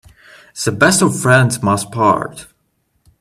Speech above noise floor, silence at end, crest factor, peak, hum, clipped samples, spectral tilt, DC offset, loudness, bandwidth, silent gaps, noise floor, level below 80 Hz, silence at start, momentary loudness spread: 50 dB; 0.75 s; 16 dB; 0 dBFS; none; under 0.1%; -4.5 dB/octave; under 0.1%; -14 LUFS; 15.5 kHz; none; -64 dBFS; -50 dBFS; 0.55 s; 10 LU